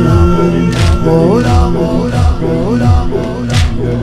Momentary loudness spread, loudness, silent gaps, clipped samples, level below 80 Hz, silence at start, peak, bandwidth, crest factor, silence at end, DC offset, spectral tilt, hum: 5 LU; -11 LUFS; none; under 0.1%; -18 dBFS; 0 s; 0 dBFS; 12.5 kHz; 10 dB; 0 s; under 0.1%; -7.5 dB/octave; none